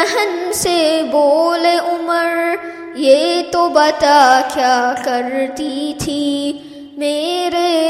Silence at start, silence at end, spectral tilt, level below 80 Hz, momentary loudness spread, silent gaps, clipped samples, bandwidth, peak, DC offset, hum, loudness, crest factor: 0 s; 0 s; -3 dB/octave; -50 dBFS; 10 LU; none; under 0.1%; 16 kHz; 0 dBFS; under 0.1%; none; -15 LUFS; 14 dB